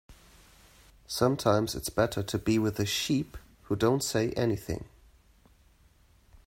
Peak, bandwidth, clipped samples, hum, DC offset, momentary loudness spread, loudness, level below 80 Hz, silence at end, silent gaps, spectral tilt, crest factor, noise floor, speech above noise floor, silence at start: -10 dBFS; 16 kHz; under 0.1%; none; under 0.1%; 11 LU; -29 LUFS; -54 dBFS; 1.6 s; none; -5 dB/octave; 20 dB; -62 dBFS; 33 dB; 0.1 s